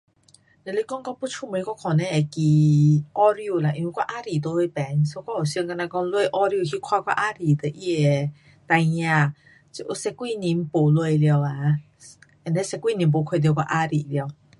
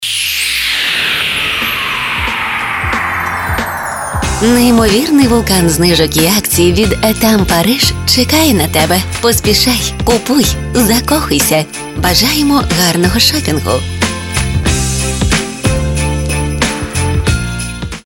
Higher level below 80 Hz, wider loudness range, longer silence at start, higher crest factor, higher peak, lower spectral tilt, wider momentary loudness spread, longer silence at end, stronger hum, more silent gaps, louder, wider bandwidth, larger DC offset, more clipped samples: second, -62 dBFS vs -24 dBFS; about the same, 3 LU vs 5 LU; first, 0.65 s vs 0 s; about the same, 16 dB vs 12 dB; second, -6 dBFS vs 0 dBFS; first, -7 dB/octave vs -3.5 dB/octave; first, 10 LU vs 7 LU; first, 0.25 s vs 0.05 s; neither; neither; second, -23 LUFS vs -11 LUFS; second, 11.5 kHz vs 17.5 kHz; neither; neither